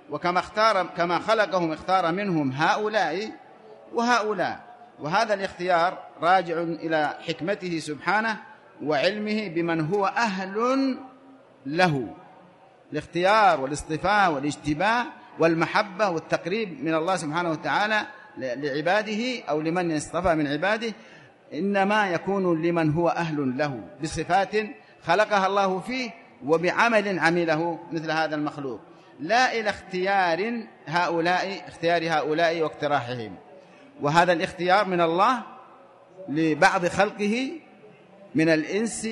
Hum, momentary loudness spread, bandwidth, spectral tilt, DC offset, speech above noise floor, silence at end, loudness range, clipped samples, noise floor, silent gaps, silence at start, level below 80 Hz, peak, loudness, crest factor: none; 11 LU; 11.5 kHz; -5 dB/octave; under 0.1%; 29 dB; 0 s; 3 LU; under 0.1%; -53 dBFS; none; 0.1 s; -58 dBFS; -4 dBFS; -24 LUFS; 20 dB